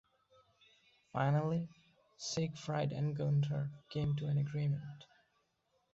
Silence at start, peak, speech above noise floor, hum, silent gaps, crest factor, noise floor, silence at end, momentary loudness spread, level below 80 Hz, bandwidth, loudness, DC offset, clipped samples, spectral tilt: 1.15 s; -20 dBFS; 44 dB; none; none; 18 dB; -79 dBFS; 0.9 s; 11 LU; -68 dBFS; 7.8 kHz; -37 LUFS; under 0.1%; under 0.1%; -7 dB/octave